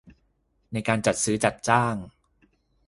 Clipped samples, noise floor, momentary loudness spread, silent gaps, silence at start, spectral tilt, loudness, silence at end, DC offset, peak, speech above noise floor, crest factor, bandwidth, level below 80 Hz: under 0.1%; -69 dBFS; 10 LU; none; 0.05 s; -4.5 dB/octave; -25 LUFS; 0.8 s; under 0.1%; -4 dBFS; 45 dB; 24 dB; 11.5 kHz; -56 dBFS